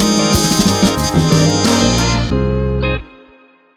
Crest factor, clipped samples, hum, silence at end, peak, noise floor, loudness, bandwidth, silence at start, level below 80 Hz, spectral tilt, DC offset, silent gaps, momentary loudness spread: 14 dB; under 0.1%; none; 0.7 s; 0 dBFS; -47 dBFS; -13 LUFS; 19 kHz; 0 s; -26 dBFS; -4.5 dB/octave; under 0.1%; none; 5 LU